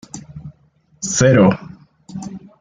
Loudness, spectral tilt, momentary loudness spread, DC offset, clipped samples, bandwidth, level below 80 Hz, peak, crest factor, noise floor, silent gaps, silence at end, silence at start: -15 LUFS; -5.5 dB/octave; 24 LU; under 0.1%; under 0.1%; 9.6 kHz; -50 dBFS; -2 dBFS; 16 dB; -56 dBFS; none; 0.2 s; 0.15 s